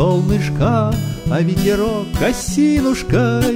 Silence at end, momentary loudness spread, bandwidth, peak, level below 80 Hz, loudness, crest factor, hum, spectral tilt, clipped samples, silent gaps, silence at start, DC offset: 0 s; 4 LU; 16.5 kHz; -4 dBFS; -30 dBFS; -17 LUFS; 12 dB; none; -6.5 dB/octave; under 0.1%; none; 0 s; under 0.1%